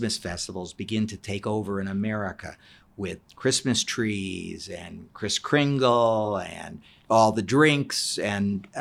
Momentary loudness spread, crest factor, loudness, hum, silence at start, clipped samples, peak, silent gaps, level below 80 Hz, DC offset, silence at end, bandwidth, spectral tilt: 16 LU; 18 dB; -25 LUFS; none; 0 s; under 0.1%; -8 dBFS; none; -58 dBFS; under 0.1%; 0 s; 14.5 kHz; -4.5 dB/octave